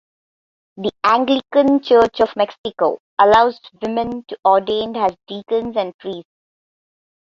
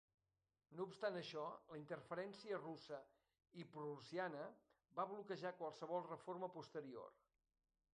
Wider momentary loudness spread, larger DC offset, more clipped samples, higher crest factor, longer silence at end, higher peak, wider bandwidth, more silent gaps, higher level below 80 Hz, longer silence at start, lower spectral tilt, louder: first, 13 LU vs 10 LU; neither; neither; about the same, 18 dB vs 20 dB; first, 1.15 s vs 0.8 s; first, 0 dBFS vs -32 dBFS; second, 7.4 kHz vs 10 kHz; first, 2.58-2.64 s, 3.00-3.17 s, 4.39-4.43 s, 5.94-5.99 s vs none; first, -54 dBFS vs under -90 dBFS; about the same, 0.75 s vs 0.7 s; about the same, -5.5 dB/octave vs -6 dB/octave; first, -17 LUFS vs -51 LUFS